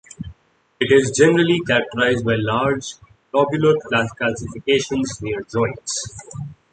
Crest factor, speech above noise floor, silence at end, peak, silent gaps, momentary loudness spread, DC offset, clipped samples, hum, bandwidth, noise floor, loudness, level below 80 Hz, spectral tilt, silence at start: 18 dB; 32 dB; 0.2 s; -2 dBFS; none; 18 LU; under 0.1%; under 0.1%; none; 9.4 kHz; -51 dBFS; -19 LUFS; -48 dBFS; -4.5 dB/octave; 0.2 s